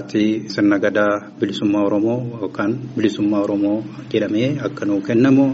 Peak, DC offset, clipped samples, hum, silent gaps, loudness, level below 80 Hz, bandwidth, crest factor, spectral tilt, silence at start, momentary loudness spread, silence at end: -2 dBFS; under 0.1%; under 0.1%; none; none; -19 LUFS; -60 dBFS; 7.8 kHz; 16 dB; -6 dB/octave; 0 s; 7 LU; 0 s